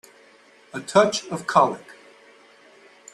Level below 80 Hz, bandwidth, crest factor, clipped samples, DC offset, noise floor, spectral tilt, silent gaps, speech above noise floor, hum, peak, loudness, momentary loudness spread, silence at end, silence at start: -70 dBFS; 12.5 kHz; 22 dB; under 0.1%; under 0.1%; -53 dBFS; -4 dB/octave; none; 32 dB; none; -2 dBFS; -21 LUFS; 18 LU; 1.35 s; 0.75 s